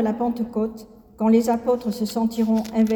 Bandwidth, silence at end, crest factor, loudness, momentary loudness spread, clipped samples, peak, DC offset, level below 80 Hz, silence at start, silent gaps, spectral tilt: 18.5 kHz; 0 s; 14 dB; -22 LUFS; 8 LU; under 0.1%; -8 dBFS; under 0.1%; -54 dBFS; 0 s; none; -6.5 dB/octave